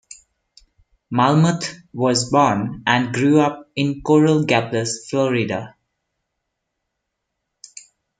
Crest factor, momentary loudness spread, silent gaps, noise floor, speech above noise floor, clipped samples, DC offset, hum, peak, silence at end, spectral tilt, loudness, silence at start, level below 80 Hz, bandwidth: 20 dB; 10 LU; none; -78 dBFS; 60 dB; under 0.1%; under 0.1%; none; 0 dBFS; 2.5 s; -5.5 dB/octave; -18 LUFS; 1.1 s; -56 dBFS; 9.4 kHz